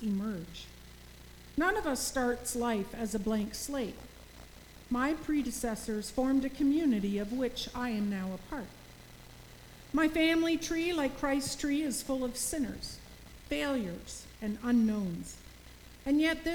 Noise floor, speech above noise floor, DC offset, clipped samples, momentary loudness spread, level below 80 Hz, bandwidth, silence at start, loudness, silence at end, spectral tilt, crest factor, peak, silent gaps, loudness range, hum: -52 dBFS; 20 dB; under 0.1%; under 0.1%; 23 LU; -52 dBFS; over 20 kHz; 0 s; -33 LUFS; 0 s; -4 dB/octave; 18 dB; -16 dBFS; none; 4 LU; none